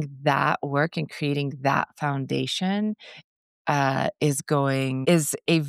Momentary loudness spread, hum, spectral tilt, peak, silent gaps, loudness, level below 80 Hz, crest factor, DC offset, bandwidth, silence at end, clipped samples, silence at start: 6 LU; none; -5 dB/octave; -8 dBFS; 3.24-3.65 s; -25 LUFS; -70 dBFS; 18 dB; under 0.1%; 14.5 kHz; 0 s; under 0.1%; 0 s